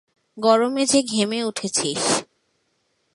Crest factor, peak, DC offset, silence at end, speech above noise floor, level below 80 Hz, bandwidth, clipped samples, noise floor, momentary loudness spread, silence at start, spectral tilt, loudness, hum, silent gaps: 20 dB; -4 dBFS; under 0.1%; 0.9 s; 49 dB; -66 dBFS; 11.5 kHz; under 0.1%; -69 dBFS; 5 LU; 0.35 s; -3 dB/octave; -20 LUFS; none; none